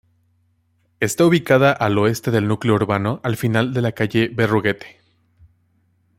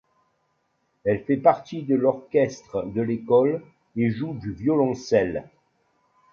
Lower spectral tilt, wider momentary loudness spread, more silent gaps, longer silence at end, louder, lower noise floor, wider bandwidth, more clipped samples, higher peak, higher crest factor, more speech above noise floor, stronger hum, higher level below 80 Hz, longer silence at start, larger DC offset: second, -6 dB/octave vs -7.5 dB/octave; about the same, 8 LU vs 10 LU; neither; first, 1.3 s vs 0.9 s; first, -18 LUFS vs -24 LUFS; second, -64 dBFS vs -71 dBFS; first, 16 kHz vs 7.4 kHz; neither; about the same, -2 dBFS vs -4 dBFS; about the same, 18 dB vs 20 dB; about the same, 46 dB vs 48 dB; neither; about the same, -56 dBFS vs -56 dBFS; about the same, 1 s vs 1.05 s; neither